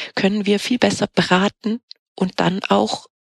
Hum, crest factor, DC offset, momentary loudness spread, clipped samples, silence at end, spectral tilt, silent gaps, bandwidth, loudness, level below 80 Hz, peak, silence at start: none; 18 dB; under 0.1%; 8 LU; under 0.1%; 0.2 s; -5 dB/octave; 1.83-1.88 s, 1.99-2.16 s; 12.5 kHz; -19 LUFS; -56 dBFS; -2 dBFS; 0 s